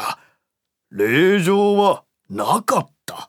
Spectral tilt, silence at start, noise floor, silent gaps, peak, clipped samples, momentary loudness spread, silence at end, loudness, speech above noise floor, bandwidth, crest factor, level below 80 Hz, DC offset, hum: -5 dB/octave; 0 s; -79 dBFS; none; -2 dBFS; under 0.1%; 18 LU; 0.05 s; -18 LUFS; 63 dB; 18.5 kHz; 16 dB; -72 dBFS; under 0.1%; none